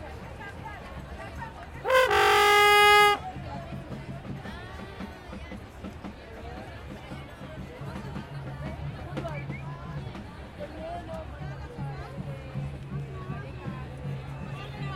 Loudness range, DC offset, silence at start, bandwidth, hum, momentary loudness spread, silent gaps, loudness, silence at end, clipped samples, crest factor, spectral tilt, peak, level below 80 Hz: 19 LU; under 0.1%; 0 s; 16.5 kHz; none; 22 LU; none; -26 LUFS; 0 s; under 0.1%; 24 dB; -4 dB/octave; -6 dBFS; -48 dBFS